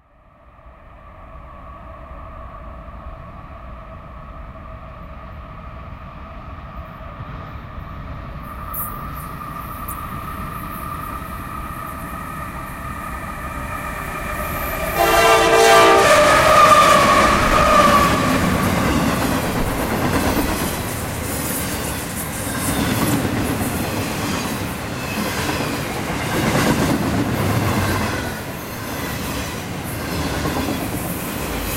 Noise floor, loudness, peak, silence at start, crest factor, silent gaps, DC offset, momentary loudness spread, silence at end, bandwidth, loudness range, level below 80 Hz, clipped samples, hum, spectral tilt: -49 dBFS; -18 LUFS; -2 dBFS; 0.65 s; 18 dB; none; under 0.1%; 24 LU; 0 s; 16 kHz; 24 LU; -34 dBFS; under 0.1%; none; -4 dB/octave